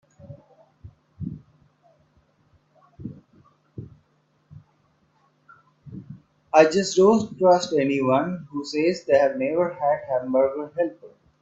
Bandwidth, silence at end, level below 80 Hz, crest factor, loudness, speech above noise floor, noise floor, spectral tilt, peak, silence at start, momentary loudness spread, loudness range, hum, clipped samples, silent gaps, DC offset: 8 kHz; 0.35 s; -62 dBFS; 22 dB; -21 LUFS; 45 dB; -65 dBFS; -5.5 dB/octave; -2 dBFS; 0.25 s; 24 LU; 23 LU; none; under 0.1%; none; under 0.1%